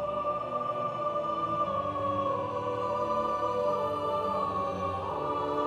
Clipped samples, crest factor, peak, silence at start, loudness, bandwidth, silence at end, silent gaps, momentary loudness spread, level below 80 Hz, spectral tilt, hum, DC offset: under 0.1%; 12 dB; -18 dBFS; 0 s; -31 LUFS; 12.5 kHz; 0 s; none; 3 LU; -58 dBFS; -7 dB/octave; none; under 0.1%